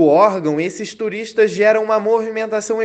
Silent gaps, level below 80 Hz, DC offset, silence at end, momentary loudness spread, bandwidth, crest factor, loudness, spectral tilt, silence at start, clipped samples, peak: none; -64 dBFS; under 0.1%; 0 s; 10 LU; 8.8 kHz; 16 dB; -17 LUFS; -5 dB/octave; 0 s; under 0.1%; 0 dBFS